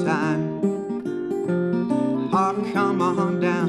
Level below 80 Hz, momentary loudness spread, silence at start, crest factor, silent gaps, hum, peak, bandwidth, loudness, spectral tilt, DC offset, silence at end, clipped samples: -66 dBFS; 6 LU; 0 s; 14 dB; none; none; -8 dBFS; 11.5 kHz; -23 LUFS; -7.5 dB/octave; under 0.1%; 0 s; under 0.1%